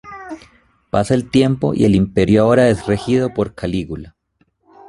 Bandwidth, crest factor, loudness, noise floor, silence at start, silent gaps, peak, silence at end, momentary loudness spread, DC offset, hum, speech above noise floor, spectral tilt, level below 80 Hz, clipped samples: 11.5 kHz; 16 dB; -16 LUFS; -63 dBFS; 0.05 s; none; 0 dBFS; 0.8 s; 19 LU; under 0.1%; none; 47 dB; -7 dB/octave; -40 dBFS; under 0.1%